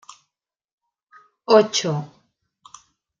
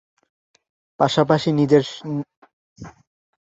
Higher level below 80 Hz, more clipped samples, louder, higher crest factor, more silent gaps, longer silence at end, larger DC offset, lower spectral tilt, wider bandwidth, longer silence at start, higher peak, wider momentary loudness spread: second, -74 dBFS vs -58 dBFS; neither; about the same, -19 LUFS vs -19 LUFS; about the same, 22 dB vs 20 dB; second, none vs 2.37-2.42 s, 2.53-2.76 s; first, 1.15 s vs 0.6 s; neither; second, -4 dB/octave vs -6.5 dB/octave; about the same, 7.6 kHz vs 8 kHz; first, 1.5 s vs 1 s; about the same, -2 dBFS vs -2 dBFS; about the same, 23 LU vs 25 LU